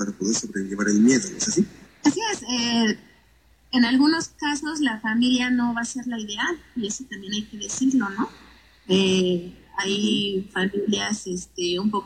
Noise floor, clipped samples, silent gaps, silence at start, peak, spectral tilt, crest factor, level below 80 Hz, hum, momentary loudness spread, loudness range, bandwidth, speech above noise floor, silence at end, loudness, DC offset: -57 dBFS; under 0.1%; none; 0 s; -6 dBFS; -3.5 dB/octave; 16 dB; -56 dBFS; none; 11 LU; 3 LU; 10.5 kHz; 34 dB; 0 s; -23 LUFS; under 0.1%